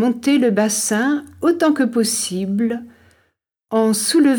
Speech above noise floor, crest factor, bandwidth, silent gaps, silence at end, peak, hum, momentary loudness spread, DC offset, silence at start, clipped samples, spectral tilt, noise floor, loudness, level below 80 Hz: 51 dB; 14 dB; 19 kHz; none; 0 s; -4 dBFS; none; 5 LU; under 0.1%; 0 s; under 0.1%; -3.5 dB/octave; -68 dBFS; -18 LUFS; -64 dBFS